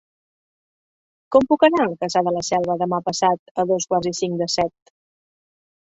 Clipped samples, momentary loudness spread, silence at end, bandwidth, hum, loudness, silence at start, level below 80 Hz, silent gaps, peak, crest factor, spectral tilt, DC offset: under 0.1%; 7 LU; 1.25 s; 8.2 kHz; none; -20 LUFS; 1.3 s; -58 dBFS; 3.39-3.55 s; -2 dBFS; 20 dB; -4.5 dB/octave; under 0.1%